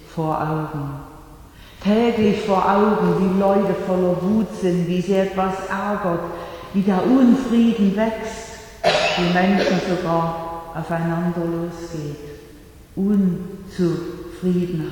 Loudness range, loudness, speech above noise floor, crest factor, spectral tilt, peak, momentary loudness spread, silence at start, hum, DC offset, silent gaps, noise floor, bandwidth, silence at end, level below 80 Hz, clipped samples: 6 LU; -20 LUFS; 24 dB; 16 dB; -7 dB/octave; -4 dBFS; 13 LU; 0 s; none; under 0.1%; none; -43 dBFS; 18.5 kHz; 0 s; -46 dBFS; under 0.1%